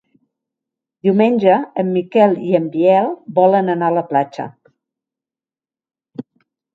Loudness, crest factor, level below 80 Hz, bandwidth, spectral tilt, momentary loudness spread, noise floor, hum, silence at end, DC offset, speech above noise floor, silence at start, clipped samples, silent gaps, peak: -15 LUFS; 18 dB; -68 dBFS; 7.4 kHz; -9 dB/octave; 18 LU; under -90 dBFS; none; 0.55 s; under 0.1%; over 75 dB; 1.05 s; under 0.1%; none; 0 dBFS